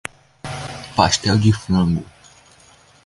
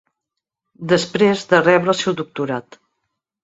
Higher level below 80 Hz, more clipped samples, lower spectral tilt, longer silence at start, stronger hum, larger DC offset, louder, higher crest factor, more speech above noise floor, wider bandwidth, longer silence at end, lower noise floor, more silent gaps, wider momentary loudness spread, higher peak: first, -40 dBFS vs -60 dBFS; neither; about the same, -5 dB/octave vs -5 dB/octave; second, 0.45 s vs 0.8 s; neither; neither; about the same, -19 LUFS vs -17 LUFS; about the same, 20 dB vs 18 dB; second, 34 dB vs 65 dB; first, 11.5 kHz vs 8 kHz; first, 1 s vs 0.8 s; second, -50 dBFS vs -82 dBFS; neither; first, 17 LU vs 11 LU; about the same, 0 dBFS vs -2 dBFS